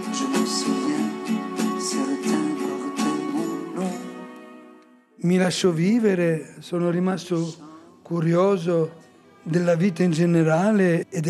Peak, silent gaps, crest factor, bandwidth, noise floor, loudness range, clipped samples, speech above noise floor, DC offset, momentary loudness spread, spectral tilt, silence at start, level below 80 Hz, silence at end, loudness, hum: -8 dBFS; none; 14 dB; 13 kHz; -51 dBFS; 5 LU; under 0.1%; 30 dB; under 0.1%; 10 LU; -6 dB/octave; 0 s; -74 dBFS; 0 s; -23 LUFS; none